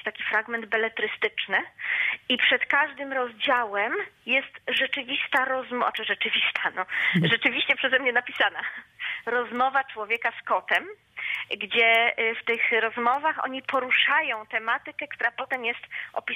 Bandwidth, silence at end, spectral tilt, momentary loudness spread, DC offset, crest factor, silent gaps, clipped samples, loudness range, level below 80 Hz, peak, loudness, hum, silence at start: 15.5 kHz; 0 s; -5 dB/octave; 9 LU; under 0.1%; 18 dB; none; under 0.1%; 3 LU; -74 dBFS; -8 dBFS; -24 LUFS; none; 0.05 s